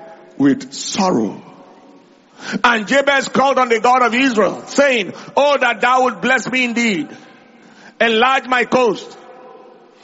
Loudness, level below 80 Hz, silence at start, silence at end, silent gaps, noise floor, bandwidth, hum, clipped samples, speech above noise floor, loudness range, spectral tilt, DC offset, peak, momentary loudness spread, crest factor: -15 LUFS; -60 dBFS; 0 s; 0.5 s; none; -46 dBFS; 8 kHz; none; under 0.1%; 31 dB; 3 LU; -2 dB/octave; under 0.1%; 0 dBFS; 10 LU; 16 dB